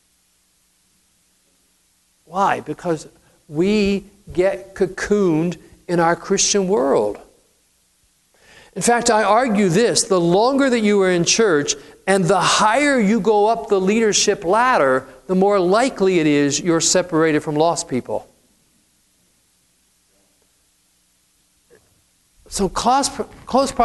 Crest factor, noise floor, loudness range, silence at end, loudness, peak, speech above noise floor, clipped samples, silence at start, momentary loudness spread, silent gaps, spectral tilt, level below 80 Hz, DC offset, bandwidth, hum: 18 dB; -61 dBFS; 10 LU; 0 s; -17 LUFS; 0 dBFS; 45 dB; under 0.1%; 2.3 s; 10 LU; none; -4 dB/octave; -48 dBFS; under 0.1%; 12 kHz; none